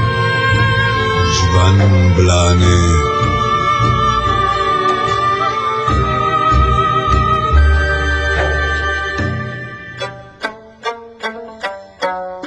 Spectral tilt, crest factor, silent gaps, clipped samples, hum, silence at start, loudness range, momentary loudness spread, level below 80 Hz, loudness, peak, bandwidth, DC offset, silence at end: -5 dB/octave; 14 dB; none; under 0.1%; none; 0 s; 8 LU; 14 LU; -22 dBFS; -14 LUFS; 0 dBFS; 8.4 kHz; under 0.1%; 0 s